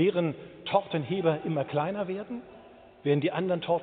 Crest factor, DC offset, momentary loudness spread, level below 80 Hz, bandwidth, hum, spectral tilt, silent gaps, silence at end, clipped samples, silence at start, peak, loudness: 20 dB; under 0.1%; 9 LU; -68 dBFS; 4.6 kHz; none; -5.5 dB/octave; none; 0 s; under 0.1%; 0 s; -10 dBFS; -29 LUFS